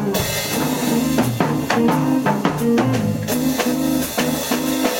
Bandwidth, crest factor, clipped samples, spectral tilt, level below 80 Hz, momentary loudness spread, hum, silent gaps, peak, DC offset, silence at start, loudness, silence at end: 17 kHz; 18 dB; under 0.1%; -5 dB/octave; -44 dBFS; 3 LU; none; none; 0 dBFS; under 0.1%; 0 s; -19 LUFS; 0 s